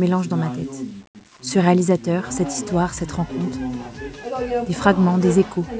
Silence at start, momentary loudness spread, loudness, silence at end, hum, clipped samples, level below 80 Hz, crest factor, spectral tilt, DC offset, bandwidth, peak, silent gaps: 0 s; 16 LU; -21 LUFS; 0 s; none; under 0.1%; -44 dBFS; 18 dB; -6.5 dB/octave; under 0.1%; 8 kHz; -2 dBFS; 1.07-1.14 s